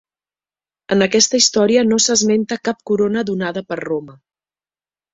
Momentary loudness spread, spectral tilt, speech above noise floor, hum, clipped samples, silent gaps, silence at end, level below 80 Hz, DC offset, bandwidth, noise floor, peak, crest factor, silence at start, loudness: 11 LU; -3 dB/octave; over 74 dB; none; under 0.1%; none; 1 s; -58 dBFS; under 0.1%; 8 kHz; under -90 dBFS; 0 dBFS; 18 dB; 0.9 s; -16 LUFS